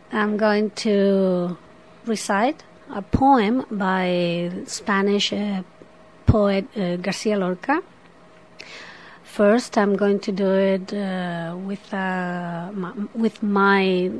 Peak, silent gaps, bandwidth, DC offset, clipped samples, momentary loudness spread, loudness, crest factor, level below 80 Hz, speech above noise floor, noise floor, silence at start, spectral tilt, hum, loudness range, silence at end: 0 dBFS; none; 11 kHz; 0.2%; under 0.1%; 14 LU; -22 LUFS; 20 dB; -44 dBFS; 28 dB; -49 dBFS; 0.1 s; -6 dB/octave; none; 3 LU; 0 s